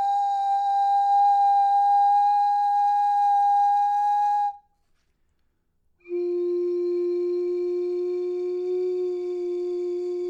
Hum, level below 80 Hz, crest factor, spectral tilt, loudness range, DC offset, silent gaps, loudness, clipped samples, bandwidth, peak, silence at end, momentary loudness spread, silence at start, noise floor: none; -72 dBFS; 8 dB; -4 dB/octave; 8 LU; under 0.1%; none; -23 LUFS; under 0.1%; 7.8 kHz; -14 dBFS; 0 s; 9 LU; 0 s; -69 dBFS